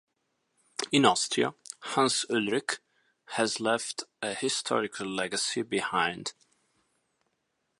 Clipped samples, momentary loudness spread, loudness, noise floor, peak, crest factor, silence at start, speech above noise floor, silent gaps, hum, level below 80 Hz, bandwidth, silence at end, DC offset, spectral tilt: under 0.1%; 13 LU; -29 LUFS; -79 dBFS; -6 dBFS; 26 dB; 0.8 s; 50 dB; none; none; -74 dBFS; 11.5 kHz; 1.5 s; under 0.1%; -2.5 dB/octave